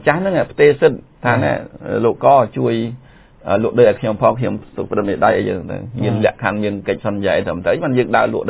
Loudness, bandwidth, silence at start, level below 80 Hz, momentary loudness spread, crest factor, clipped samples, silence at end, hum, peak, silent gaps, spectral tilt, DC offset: -16 LUFS; 4 kHz; 0 s; -44 dBFS; 10 LU; 16 dB; under 0.1%; 0 s; none; 0 dBFS; none; -11 dB/octave; under 0.1%